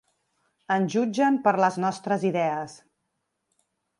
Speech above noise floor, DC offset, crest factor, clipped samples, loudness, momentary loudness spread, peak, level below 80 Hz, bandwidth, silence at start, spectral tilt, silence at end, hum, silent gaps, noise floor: 55 dB; under 0.1%; 18 dB; under 0.1%; -25 LUFS; 7 LU; -8 dBFS; -76 dBFS; 11.5 kHz; 0.7 s; -6 dB/octave; 1.25 s; none; none; -78 dBFS